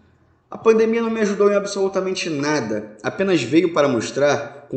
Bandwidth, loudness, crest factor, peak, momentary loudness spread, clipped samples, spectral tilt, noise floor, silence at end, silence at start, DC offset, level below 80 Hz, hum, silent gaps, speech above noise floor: 9 kHz; -19 LUFS; 18 dB; -2 dBFS; 8 LU; under 0.1%; -5 dB/octave; -57 dBFS; 0 s; 0.5 s; under 0.1%; -62 dBFS; none; none; 38 dB